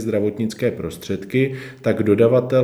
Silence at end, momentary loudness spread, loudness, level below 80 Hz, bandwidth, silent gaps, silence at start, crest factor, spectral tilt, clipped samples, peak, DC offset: 0 s; 11 LU; -20 LUFS; -54 dBFS; 15.5 kHz; none; 0 s; 16 dB; -7.5 dB/octave; under 0.1%; -4 dBFS; under 0.1%